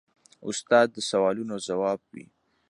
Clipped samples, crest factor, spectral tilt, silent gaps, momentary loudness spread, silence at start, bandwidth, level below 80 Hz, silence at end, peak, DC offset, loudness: under 0.1%; 20 dB; -3.5 dB/octave; none; 13 LU; 0.4 s; 11 kHz; -72 dBFS; 0.45 s; -6 dBFS; under 0.1%; -26 LUFS